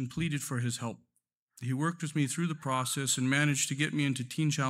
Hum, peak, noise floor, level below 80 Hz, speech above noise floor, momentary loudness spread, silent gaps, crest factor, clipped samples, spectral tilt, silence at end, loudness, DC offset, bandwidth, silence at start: none; -12 dBFS; -65 dBFS; -66 dBFS; 33 dB; 9 LU; 1.39-1.47 s; 18 dB; under 0.1%; -4 dB/octave; 0 s; -31 LUFS; under 0.1%; 16 kHz; 0 s